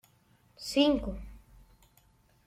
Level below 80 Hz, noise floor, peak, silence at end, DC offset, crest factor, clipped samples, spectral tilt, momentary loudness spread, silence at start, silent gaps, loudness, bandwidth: -50 dBFS; -66 dBFS; -12 dBFS; 1.1 s; under 0.1%; 22 dB; under 0.1%; -4.5 dB/octave; 20 LU; 0.6 s; none; -29 LUFS; 15.5 kHz